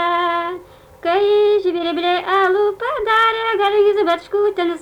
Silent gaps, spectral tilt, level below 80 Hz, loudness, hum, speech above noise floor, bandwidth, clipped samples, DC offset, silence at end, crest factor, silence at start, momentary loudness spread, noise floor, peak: none; -4 dB/octave; -54 dBFS; -17 LUFS; none; 21 dB; 9.6 kHz; under 0.1%; under 0.1%; 0 s; 12 dB; 0 s; 7 LU; -38 dBFS; -6 dBFS